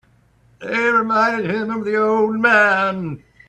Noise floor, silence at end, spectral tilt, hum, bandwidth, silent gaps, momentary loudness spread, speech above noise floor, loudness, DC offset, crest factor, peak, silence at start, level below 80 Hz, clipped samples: -55 dBFS; 0.3 s; -6 dB/octave; none; 10.5 kHz; none; 12 LU; 38 dB; -17 LUFS; under 0.1%; 18 dB; -2 dBFS; 0.6 s; -58 dBFS; under 0.1%